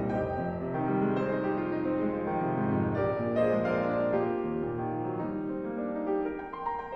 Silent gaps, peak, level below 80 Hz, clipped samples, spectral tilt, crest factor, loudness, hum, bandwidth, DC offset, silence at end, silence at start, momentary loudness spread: none; -16 dBFS; -56 dBFS; under 0.1%; -10 dB/octave; 14 dB; -31 LUFS; none; 6 kHz; under 0.1%; 0 s; 0 s; 6 LU